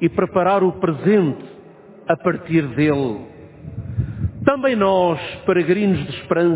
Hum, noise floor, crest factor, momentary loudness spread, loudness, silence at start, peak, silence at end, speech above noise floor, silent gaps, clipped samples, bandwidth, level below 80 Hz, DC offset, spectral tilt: none; -43 dBFS; 18 dB; 13 LU; -19 LUFS; 0 s; 0 dBFS; 0 s; 25 dB; none; under 0.1%; 4 kHz; -42 dBFS; under 0.1%; -11.5 dB/octave